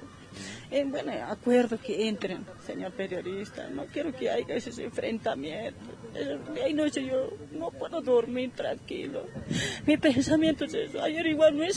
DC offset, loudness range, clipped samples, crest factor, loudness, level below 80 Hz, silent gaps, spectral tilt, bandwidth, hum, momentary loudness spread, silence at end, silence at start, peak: under 0.1%; 6 LU; under 0.1%; 18 dB; -30 LUFS; -60 dBFS; none; -5 dB/octave; 10.5 kHz; none; 14 LU; 0 s; 0 s; -10 dBFS